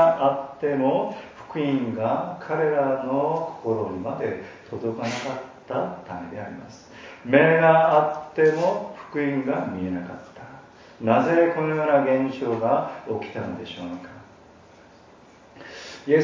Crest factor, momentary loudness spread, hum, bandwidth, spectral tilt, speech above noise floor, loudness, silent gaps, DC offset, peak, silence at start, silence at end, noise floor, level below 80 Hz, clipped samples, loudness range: 22 dB; 20 LU; none; 7.6 kHz; -7 dB/octave; 27 dB; -23 LUFS; none; under 0.1%; -2 dBFS; 0 s; 0 s; -50 dBFS; -60 dBFS; under 0.1%; 9 LU